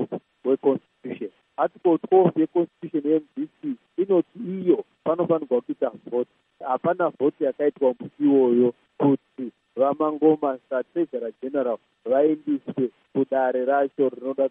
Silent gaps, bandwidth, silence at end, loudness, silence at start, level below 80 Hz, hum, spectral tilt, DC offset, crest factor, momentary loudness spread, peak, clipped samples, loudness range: none; 3.8 kHz; 0 s; -24 LUFS; 0 s; -78 dBFS; none; -11 dB/octave; under 0.1%; 18 dB; 12 LU; -6 dBFS; under 0.1%; 3 LU